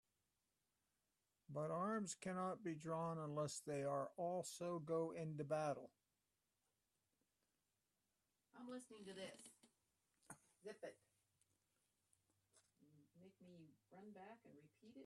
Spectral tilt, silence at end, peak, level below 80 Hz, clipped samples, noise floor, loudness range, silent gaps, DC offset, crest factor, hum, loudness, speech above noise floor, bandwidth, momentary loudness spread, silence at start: -5.5 dB/octave; 0 s; -32 dBFS; under -90 dBFS; under 0.1%; under -90 dBFS; 18 LU; none; under 0.1%; 20 dB; none; -48 LUFS; over 43 dB; 13 kHz; 21 LU; 1.5 s